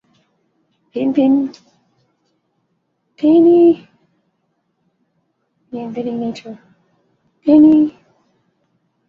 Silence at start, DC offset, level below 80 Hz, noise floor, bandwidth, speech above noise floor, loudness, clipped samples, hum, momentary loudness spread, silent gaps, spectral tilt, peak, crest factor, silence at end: 0.95 s; under 0.1%; -60 dBFS; -67 dBFS; 5.8 kHz; 55 dB; -14 LUFS; under 0.1%; none; 20 LU; none; -8.5 dB/octave; -2 dBFS; 16 dB; 1.2 s